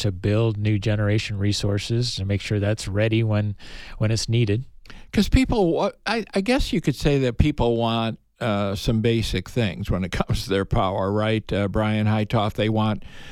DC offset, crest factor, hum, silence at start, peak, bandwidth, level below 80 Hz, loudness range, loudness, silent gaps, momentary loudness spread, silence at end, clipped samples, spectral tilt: under 0.1%; 20 dB; none; 0 s; -2 dBFS; 13.5 kHz; -34 dBFS; 2 LU; -23 LUFS; none; 5 LU; 0 s; under 0.1%; -6 dB/octave